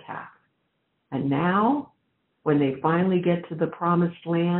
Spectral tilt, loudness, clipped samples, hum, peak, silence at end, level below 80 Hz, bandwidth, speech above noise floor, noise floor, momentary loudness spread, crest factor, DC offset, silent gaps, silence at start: -7 dB/octave; -24 LUFS; under 0.1%; none; -10 dBFS; 0 s; -66 dBFS; 4.1 kHz; 51 dB; -74 dBFS; 9 LU; 16 dB; under 0.1%; none; 0.1 s